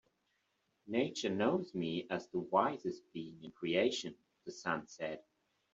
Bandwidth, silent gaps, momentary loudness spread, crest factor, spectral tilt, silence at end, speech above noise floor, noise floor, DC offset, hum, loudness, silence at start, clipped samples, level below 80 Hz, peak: 7.8 kHz; none; 15 LU; 22 dB; -5 dB/octave; 0.55 s; 44 dB; -81 dBFS; under 0.1%; none; -37 LUFS; 0.85 s; under 0.1%; -78 dBFS; -16 dBFS